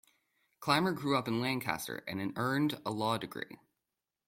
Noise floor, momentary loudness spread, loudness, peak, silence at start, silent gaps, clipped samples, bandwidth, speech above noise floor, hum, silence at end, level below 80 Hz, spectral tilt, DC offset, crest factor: -89 dBFS; 11 LU; -34 LUFS; -14 dBFS; 0.6 s; none; under 0.1%; 16.5 kHz; 55 dB; none; 0.75 s; -70 dBFS; -5 dB/octave; under 0.1%; 22 dB